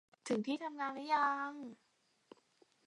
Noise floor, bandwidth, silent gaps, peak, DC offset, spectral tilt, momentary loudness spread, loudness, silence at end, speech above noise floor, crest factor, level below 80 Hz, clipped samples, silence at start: -72 dBFS; 11.5 kHz; none; -22 dBFS; under 0.1%; -4.5 dB/octave; 13 LU; -38 LUFS; 1.1 s; 34 dB; 18 dB; under -90 dBFS; under 0.1%; 0.25 s